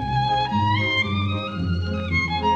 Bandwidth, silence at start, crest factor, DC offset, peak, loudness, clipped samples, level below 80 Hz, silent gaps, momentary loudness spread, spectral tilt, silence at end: 7.8 kHz; 0 s; 12 dB; 0.1%; -10 dBFS; -22 LUFS; under 0.1%; -42 dBFS; none; 5 LU; -6.5 dB/octave; 0 s